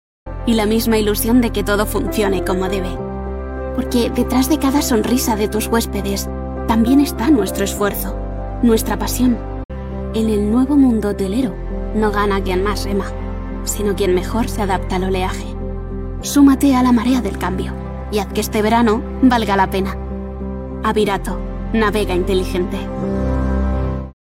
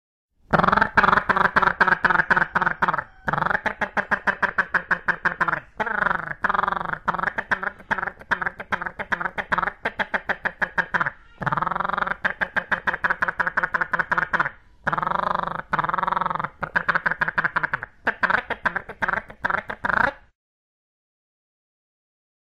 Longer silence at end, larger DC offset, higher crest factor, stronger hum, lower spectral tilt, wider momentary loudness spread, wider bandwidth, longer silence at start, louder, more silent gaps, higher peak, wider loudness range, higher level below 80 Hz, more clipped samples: second, 0.2 s vs 2.25 s; second, under 0.1% vs 0.1%; about the same, 16 dB vs 18 dB; neither; about the same, -5.5 dB/octave vs -5.5 dB/octave; first, 12 LU vs 8 LU; first, 16.5 kHz vs 12 kHz; second, 0.25 s vs 0.5 s; first, -18 LUFS vs -23 LUFS; first, 9.65-9.69 s vs none; first, -2 dBFS vs -6 dBFS; second, 3 LU vs 6 LU; first, -26 dBFS vs -48 dBFS; neither